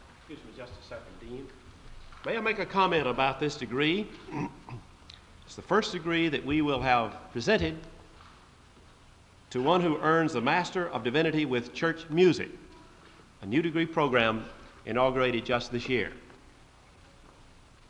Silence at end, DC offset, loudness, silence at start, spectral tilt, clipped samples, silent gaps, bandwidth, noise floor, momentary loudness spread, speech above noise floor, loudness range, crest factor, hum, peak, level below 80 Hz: 1.55 s; under 0.1%; -28 LUFS; 0 s; -5.5 dB/octave; under 0.1%; none; 10.5 kHz; -56 dBFS; 20 LU; 27 dB; 4 LU; 22 dB; none; -8 dBFS; -54 dBFS